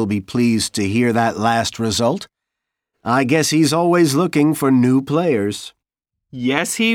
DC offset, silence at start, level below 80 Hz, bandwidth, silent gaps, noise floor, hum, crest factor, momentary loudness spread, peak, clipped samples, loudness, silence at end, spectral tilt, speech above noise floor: under 0.1%; 0 s; -56 dBFS; 17 kHz; none; -82 dBFS; none; 16 dB; 10 LU; -2 dBFS; under 0.1%; -17 LUFS; 0 s; -5 dB/octave; 65 dB